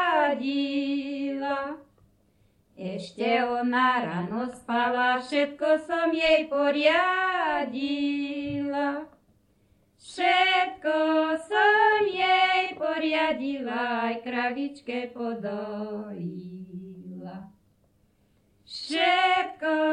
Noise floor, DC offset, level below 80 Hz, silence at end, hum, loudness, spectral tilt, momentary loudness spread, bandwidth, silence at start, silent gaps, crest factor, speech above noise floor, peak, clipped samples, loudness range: -65 dBFS; under 0.1%; -66 dBFS; 0 s; none; -25 LUFS; -5 dB/octave; 16 LU; 10.5 kHz; 0 s; none; 16 dB; 40 dB; -10 dBFS; under 0.1%; 10 LU